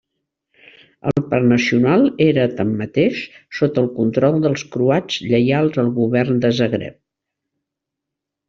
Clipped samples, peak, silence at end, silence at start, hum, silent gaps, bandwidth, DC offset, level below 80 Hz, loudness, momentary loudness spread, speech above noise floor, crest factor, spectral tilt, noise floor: under 0.1%; -2 dBFS; 1.55 s; 1.05 s; none; none; 7.4 kHz; under 0.1%; -54 dBFS; -17 LUFS; 7 LU; 66 dB; 16 dB; -7 dB/octave; -82 dBFS